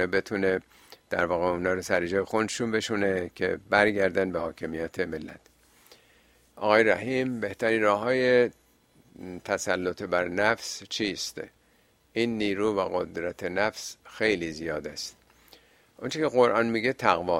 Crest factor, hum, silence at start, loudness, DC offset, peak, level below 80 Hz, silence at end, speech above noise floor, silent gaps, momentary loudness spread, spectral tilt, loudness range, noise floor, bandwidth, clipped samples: 24 dB; none; 0 s; -27 LUFS; under 0.1%; -4 dBFS; -60 dBFS; 0 s; 37 dB; none; 12 LU; -4.5 dB/octave; 4 LU; -64 dBFS; 16 kHz; under 0.1%